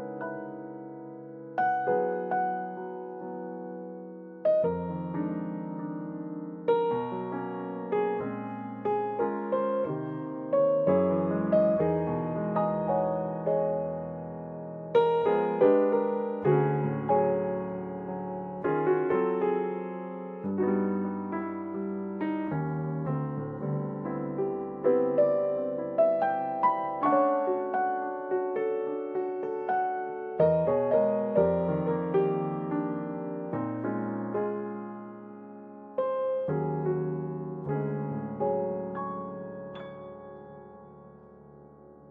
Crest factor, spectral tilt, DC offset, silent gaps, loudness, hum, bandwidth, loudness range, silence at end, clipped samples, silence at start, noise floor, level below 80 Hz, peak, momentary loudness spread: 18 dB; -11 dB/octave; under 0.1%; none; -29 LUFS; none; 4.7 kHz; 6 LU; 0 s; under 0.1%; 0 s; -52 dBFS; -62 dBFS; -12 dBFS; 14 LU